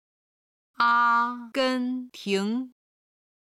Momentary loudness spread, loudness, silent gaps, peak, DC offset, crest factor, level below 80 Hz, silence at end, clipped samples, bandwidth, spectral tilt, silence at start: 12 LU; -25 LUFS; none; -10 dBFS; under 0.1%; 18 dB; -76 dBFS; 0.85 s; under 0.1%; 14.5 kHz; -4.5 dB/octave; 0.8 s